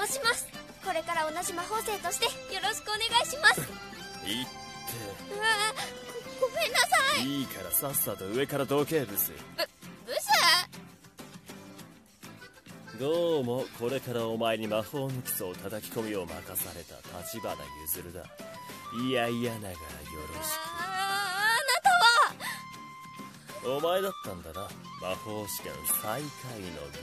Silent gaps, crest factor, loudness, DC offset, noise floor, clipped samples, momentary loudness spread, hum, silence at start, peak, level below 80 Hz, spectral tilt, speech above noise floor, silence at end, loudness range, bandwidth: none; 22 dB; -29 LUFS; under 0.1%; -51 dBFS; under 0.1%; 20 LU; none; 0 s; -8 dBFS; -62 dBFS; -2.5 dB/octave; 20 dB; 0 s; 8 LU; 14 kHz